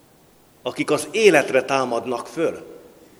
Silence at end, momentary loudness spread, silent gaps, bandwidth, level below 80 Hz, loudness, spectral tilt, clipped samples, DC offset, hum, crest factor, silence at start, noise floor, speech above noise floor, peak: 0.45 s; 15 LU; none; 15.5 kHz; -66 dBFS; -20 LUFS; -4 dB/octave; under 0.1%; under 0.1%; none; 22 dB; 0.65 s; -54 dBFS; 33 dB; 0 dBFS